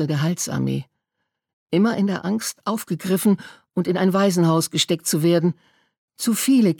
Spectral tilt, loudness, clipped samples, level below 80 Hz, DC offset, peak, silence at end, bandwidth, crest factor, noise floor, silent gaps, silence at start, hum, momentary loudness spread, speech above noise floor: -5 dB/octave; -21 LUFS; under 0.1%; -64 dBFS; under 0.1%; -4 dBFS; 0.05 s; 19 kHz; 16 dB; -79 dBFS; 1.53-1.67 s, 5.98-6.08 s; 0 s; none; 8 LU; 58 dB